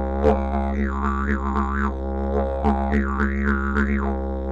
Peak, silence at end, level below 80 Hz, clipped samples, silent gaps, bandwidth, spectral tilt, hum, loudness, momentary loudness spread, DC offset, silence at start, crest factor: -4 dBFS; 0 s; -26 dBFS; under 0.1%; none; 7.4 kHz; -9 dB/octave; none; -23 LUFS; 4 LU; 0.5%; 0 s; 18 dB